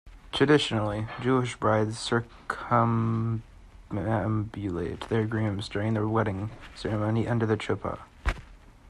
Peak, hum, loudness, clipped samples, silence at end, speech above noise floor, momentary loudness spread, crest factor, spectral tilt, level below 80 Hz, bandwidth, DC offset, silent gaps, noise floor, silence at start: -10 dBFS; none; -28 LUFS; under 0.1%; 0 s; 22 dB; 12 LU; 18 dB; -6.5 dB/octave; -44 dBFS; 11 kHz; under 0.1%; none; -49 dBFS; 0.05 s